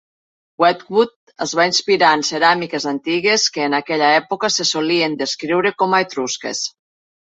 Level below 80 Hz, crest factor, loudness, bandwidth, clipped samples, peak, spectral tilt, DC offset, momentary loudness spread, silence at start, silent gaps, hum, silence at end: -66 dBFS; 16 dB; -17 LUFS; 8.2 kHz; under 0.1%; -2 dBFS; -2.5 dB/octave; under 0.1%; 8 LU; 0.6 s; 1.16-1.27 s; none; 0.6 s